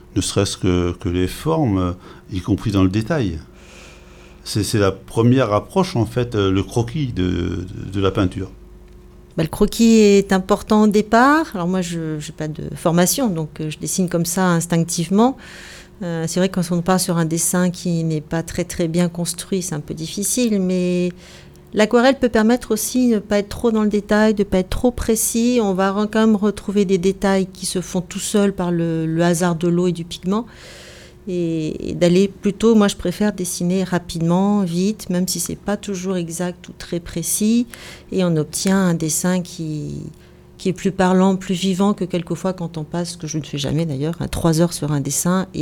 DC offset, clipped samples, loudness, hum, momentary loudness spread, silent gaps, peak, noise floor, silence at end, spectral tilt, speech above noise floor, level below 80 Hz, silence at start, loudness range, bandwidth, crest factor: under 0.1%; under 0.1%; -19 LUFS; none; 11 LU; none; -2 dBFS; -43 dBFS; 0 s; -5.5 dB/octave; 24 dB; -40 dBFS; 0.1 s; 4 LU; 18 kHz; 18 dB